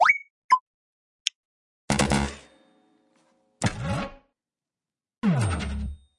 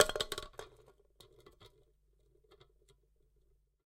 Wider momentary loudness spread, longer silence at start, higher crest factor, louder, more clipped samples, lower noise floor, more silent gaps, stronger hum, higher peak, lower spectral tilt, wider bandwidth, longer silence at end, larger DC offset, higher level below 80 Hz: second, 10 LU vs 26 LU; about the same, 0 s vs 0 s; second, 26 dB vs 34 dB; first, -27 LUFS vs -37 LUFS; neither; first, under -90 dBFS vs -72 dBFS; first, 0.30-0.49 s, 0.61-1.25 s, 1.35-1.88 s vs none; neither; first, -2 dBFS vs -8 dBFS; first, -4.5 dB/octave vs -1 dB/octave; second, 11.5 kHz vs 16 kHz; second, 0.2 s vs 2.2 s; neither; first, -42 dBFS vs -60 dBFS